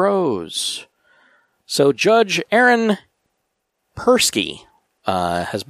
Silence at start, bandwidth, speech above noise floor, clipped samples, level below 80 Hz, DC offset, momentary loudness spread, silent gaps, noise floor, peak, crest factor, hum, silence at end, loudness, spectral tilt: 0 s; 15.5 kHz; 56 dB; under 0.1%; -56 dBFS; under 0.1%; 12 LU; none; -74 dBFS; -2 dBFS; 18 dB; none; 0.05 s; -18 LUFS; -3.5 dB/octave